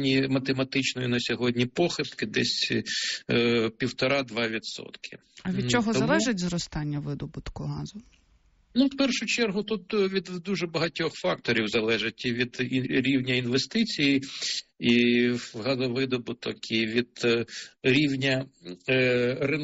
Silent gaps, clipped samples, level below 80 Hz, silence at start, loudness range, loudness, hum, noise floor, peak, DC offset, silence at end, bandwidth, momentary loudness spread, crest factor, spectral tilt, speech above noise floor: none; under 0.1%; -56 dBFS; 0 s; 3 LU; -26 LUFS; none; -63 dBFS; -12 dBFS; under 0.1%; 0 s; 8 kHz; 11 LU; 16 dB; -3.5 dB/octave; 36 dB